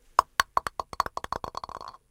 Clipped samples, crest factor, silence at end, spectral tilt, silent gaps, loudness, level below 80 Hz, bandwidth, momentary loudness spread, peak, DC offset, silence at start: under 0.1%; 30 dB; 0.2 s; -1.5 dB/octave; none; -30 LUFS; -52 dBFS; 17 kHz; 14 LU; 0 dBFS; under 0.1%; 0.2 s